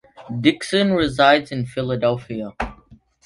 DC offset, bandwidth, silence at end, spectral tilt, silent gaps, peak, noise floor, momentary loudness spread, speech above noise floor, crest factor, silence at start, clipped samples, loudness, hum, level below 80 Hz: under 0.1%; 11.5 kHz; 0.5 s; -5.5 dB/octave; none; 0 dBFS; -50 dBFS; 15 LU; 31 dB; 20 dB; 0.2 s; under 0.1%; -19 LUFS; none; -44 dBFS